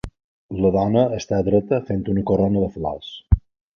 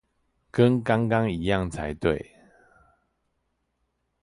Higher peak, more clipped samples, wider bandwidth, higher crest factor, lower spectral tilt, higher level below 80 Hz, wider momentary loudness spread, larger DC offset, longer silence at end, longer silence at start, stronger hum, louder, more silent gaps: first, -2 dBFS vs -6 dBFS; neither; second, 6.8 kHz vs 11.5 kHz; about the same, 18 dB vs 20 dB; about the same, -8 dB/octave vs -7.5 dB/octave; first, -30 dBFS vs -48 dBFS; about the same, 10 LU vs 11 LU; neither; second, 0.4 s vs 2 s; second, 0.05 s vs 0.55 s; neither; first, -21 LUFS vs -25 LUFS; first, 0.24-0.49 s vs none